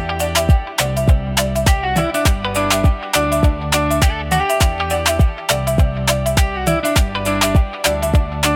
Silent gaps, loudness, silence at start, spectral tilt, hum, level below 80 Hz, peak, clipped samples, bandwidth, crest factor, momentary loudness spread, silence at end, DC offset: none; -17 LUFS; 0 s; -4.5 dB/octave; none; -22 dBFS; -2 dBFS; under 0.1%; 18 kHz; 14 dB; 3 LU; 0 s; under 0.1%